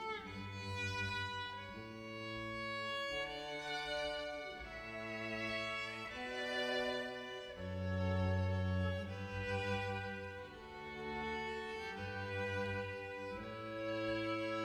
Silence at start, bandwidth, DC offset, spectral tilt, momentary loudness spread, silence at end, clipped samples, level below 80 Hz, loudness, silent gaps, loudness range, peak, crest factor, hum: 0 s; 12.5 kHz; under 0.1%; -5.5 dB/octave; 9 LU; 0 s; under 0.1%; -62 dBFS; -42 LUFS; none; 3 LU; -26 dBFS; 16 dB; none